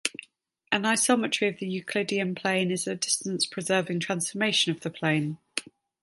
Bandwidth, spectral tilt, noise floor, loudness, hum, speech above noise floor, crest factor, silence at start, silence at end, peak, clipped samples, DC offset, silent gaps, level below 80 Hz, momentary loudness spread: 12 kHz; -3 dB/octave; -59 dBFS; -27 LUFS; none; 32 dB; 24 dB; 0.05 s; 0.4 s; -4 dBFS; under 0.1%; under 0.1%; none; -74 dBFS; 9 LU